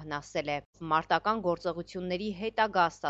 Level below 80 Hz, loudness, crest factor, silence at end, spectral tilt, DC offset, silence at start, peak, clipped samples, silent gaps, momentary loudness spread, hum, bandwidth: -60 dBFS; -31 LUFS; 18 dB; 0 s; -5 dB/octave; under 0.1%; 0 s; -12 dBFS; under 0.1%; 0.65-0.73 s; 9 LU; none; 8.2 kHz